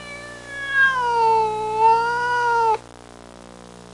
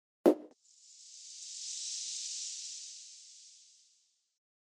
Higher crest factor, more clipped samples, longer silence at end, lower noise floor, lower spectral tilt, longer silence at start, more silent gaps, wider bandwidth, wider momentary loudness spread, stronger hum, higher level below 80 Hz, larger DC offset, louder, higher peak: second, 14 dB vs 30 dB; neither; second, 0 s vs 0.95 s; second, -42 dBFS vs -73 dBFS; about the same, -3 dB/octave vs -2.5 dB/octave; second, 0 s vs 0.25 s; neither; about the same, 11.5 kHz vs 12.5 kHz; second, 14 LU vs 25 LU; first, 60 Hz at -45 dBFS vs none; first, -54 dBFS vs under -90 dBFS; neither; first, -19 LUFS vs -37 LUFS; first, -6 dBFS vs -10 dBFS